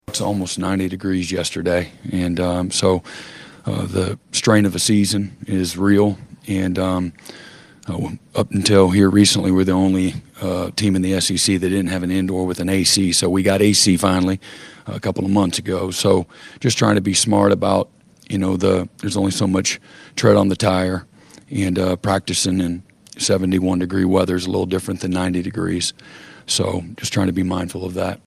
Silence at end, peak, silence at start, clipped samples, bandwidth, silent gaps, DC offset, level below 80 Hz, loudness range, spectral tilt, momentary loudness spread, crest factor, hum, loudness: 0.1 s; 0 dBFS; 0.1 s; under 0.1%; 14.5 kHz; none; under 0.1%; -54 dBFS; 5 LU; -4.5 dB/octave; 12 LU; 18 dB; none; -18 LUFS